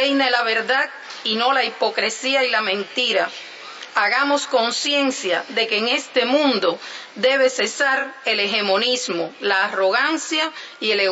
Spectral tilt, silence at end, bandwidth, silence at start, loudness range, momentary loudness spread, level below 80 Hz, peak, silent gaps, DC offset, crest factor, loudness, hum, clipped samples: -1.5 dB/octave; 0 s; 8 kHz; 0 s; 1 LU; 8 LU; -80 dBFS; -4 dBFS; none; under 0.1%; 16 dB; -19 LUFS; none; under 0.1%